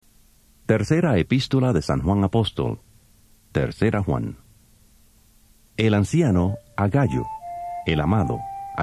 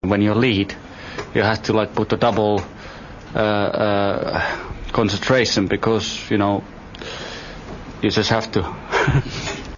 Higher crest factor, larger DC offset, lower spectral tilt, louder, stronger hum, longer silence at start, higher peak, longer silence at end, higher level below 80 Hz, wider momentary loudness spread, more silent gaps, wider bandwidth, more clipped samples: about the same, 20 dB vs 18 dB; neither; first, -7 dB/octave vs -5.5 dB/octave; about the same, -22 LUFS vs -20 LUFS; neither; first, 0.7 s vs 0 s; about the same, -4 dBFS vs -4 dBFS; about the same, 0 s vs 0 s; about the same, -38 dBFS vs -40 dBFS; second, 12 LU vs 16 LU; neither; first, 13 kHz vs 7.4 kHz; neither